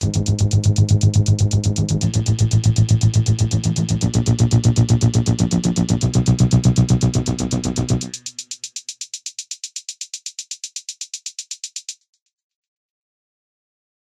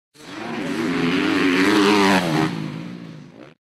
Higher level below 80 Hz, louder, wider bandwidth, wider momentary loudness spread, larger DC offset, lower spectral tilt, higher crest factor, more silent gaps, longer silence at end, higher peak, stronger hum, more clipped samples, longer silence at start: first, -34 dBFS vs -58 dBFS; about the same, -18 LUFS vs -19 LUFS; second, 11 kHz vs 14.5 kHz; second, 14 LU vs 20 LU; neither; about the same, -5.5 dB/octave vs -5 dB/octave; about the same, 16 dB vs 16 dB; neither; first, 2.25 s vs 0.15 s; about the same, -2 dBFS vs -4 dBFS; neither; neither; second, 0 s vs 0.2 s